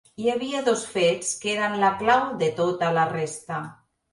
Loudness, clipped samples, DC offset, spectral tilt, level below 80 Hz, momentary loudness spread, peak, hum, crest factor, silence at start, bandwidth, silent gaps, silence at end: -24 LUFS; under 0.1%; under 0.1%; -4 dB/octave; -64 dBFS; 10 LU; -6 dBFS; none; 18 dB; 0.2 s; 11.5 kHz; none; 0.4 s